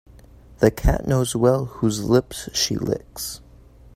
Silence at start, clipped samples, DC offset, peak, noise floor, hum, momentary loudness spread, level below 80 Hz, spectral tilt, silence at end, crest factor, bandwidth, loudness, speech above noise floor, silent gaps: 0.6 s; under 0.1%; under 0.1%; -2 dBFS; -47 dBFS; none; 12 LU; -32 dBFS; -5 dB/octave; 0.6 s; 20 dB; 16 kHz; -22 LUFS; 27 dB; none